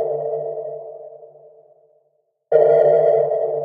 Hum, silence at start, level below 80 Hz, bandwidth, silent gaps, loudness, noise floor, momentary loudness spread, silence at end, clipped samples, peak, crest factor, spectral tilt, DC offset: none; 0 s; -78 dBFS; 4.4 kHz; none; -17 LUFS; -66 dBFS; 20 LU; 0 s; under 0.1%; -2 dBFS; 18 dB; -9 dB/octave; under 0.1%